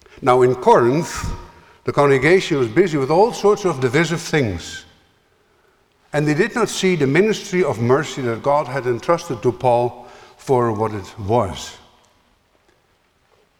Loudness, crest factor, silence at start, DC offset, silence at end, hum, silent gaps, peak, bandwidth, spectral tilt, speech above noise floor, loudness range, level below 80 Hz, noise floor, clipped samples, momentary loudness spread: -18 LUFS; 18 dB; 0.2 s; under 0.1%; 1.85 s; none; none; -2 dBFS; 16 kHz; -5.5 dB/octave; 43 dB; 5 LU; -44 dBFS; -61 dBFS; under 0.1%; 13 LU